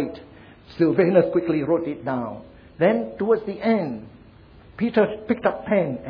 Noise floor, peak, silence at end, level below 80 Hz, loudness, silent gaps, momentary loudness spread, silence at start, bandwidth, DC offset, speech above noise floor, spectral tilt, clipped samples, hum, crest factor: -48 dBFS; -4 dBFS; 0 s; -54 dBFS; -22 LUFS; none; 13 LU; 0 s; 5.2 kHz; under 0.1%; 27 dB; -10 dB/octave; under 0.1%; none; 18 dB